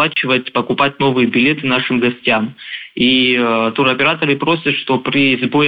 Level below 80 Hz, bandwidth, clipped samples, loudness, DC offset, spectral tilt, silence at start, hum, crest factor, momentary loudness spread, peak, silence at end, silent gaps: -54 dBFS; 5 kHz; under 0.1%; -14 LUFS; under 0.1%; -7.5 dB/octave; 0 s; none; 14 dB; 4 LU; 0 dBFS; 0 s; none